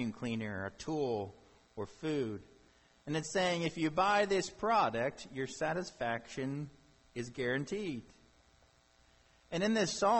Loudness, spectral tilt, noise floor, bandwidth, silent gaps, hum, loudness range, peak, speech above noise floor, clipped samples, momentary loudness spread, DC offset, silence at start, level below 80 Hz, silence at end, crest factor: -35 LUFS; -4.5 dB/octave; -67 dBFS; 8.6 kHz; none; none; 7 LU; -18 dBFS; 32 dB; under 0.1%; 15 LU; under 0.1%; 0 s; -66 dBFS; 0 s; 18 dB